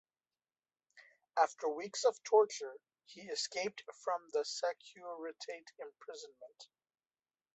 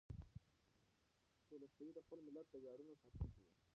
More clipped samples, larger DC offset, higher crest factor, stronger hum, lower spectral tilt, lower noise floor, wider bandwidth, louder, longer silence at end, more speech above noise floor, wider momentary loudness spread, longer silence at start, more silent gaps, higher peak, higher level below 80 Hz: neither; neither; about the same, 22 dB vs 22 dB; neither; second, -1 dB/octave vs -9.5 dB/octave; first, under -90 dBFS vs -82 dBFS; about the same, 8.2 kHz vs 7.6 kHz; first, -37 LUFS vs -59 LUFS; first, 0.9 s vs 0.25 s; first, over 52 dB vs 26 dB; first, 22 LU vs 9 LU; first, 0.95 s vs 0.1 s; neither; first, -16 dBFS vs -36 dBFS; second, under -90 dBFS vs -64 dBFS